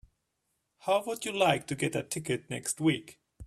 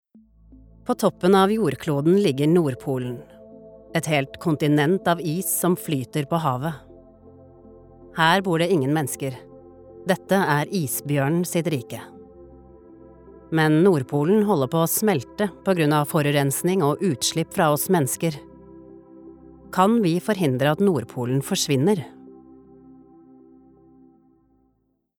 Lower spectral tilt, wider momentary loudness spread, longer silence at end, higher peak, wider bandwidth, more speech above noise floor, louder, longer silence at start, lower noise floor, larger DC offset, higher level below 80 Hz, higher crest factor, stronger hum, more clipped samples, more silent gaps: second, -4 dB/octave vs -5.5 dB/octave; second, 7 LU vs 10 LU; second, 0 s vs 2.85 s; second, -10 dBFS vs -4 dBFS; second, 14 kHz vs over 20 kHz; about the same, 50 dB vs 48 dB; second, -31 LUFS vs -22 LUFS; about the same, 0.85 s vs 0.85 s; first, -80 dBFS vs -69 dBFS; neither; about the same, -62 dBFS vs -58 dBFS; about the same, 22 dB vs 20 dB; neither; neither; neither